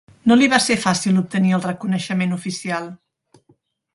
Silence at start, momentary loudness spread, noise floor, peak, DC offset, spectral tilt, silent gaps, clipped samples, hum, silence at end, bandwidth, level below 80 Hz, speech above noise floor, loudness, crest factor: 0.25 s; 11 LU; -60 dBFS; 0 dBFS; under 0.1%; -4.5 dB/octave; none; under 0.1%; none; 1 s; 11.5 kHz; -58 dBFS; 42 dB; -18 LUFS; 20 dB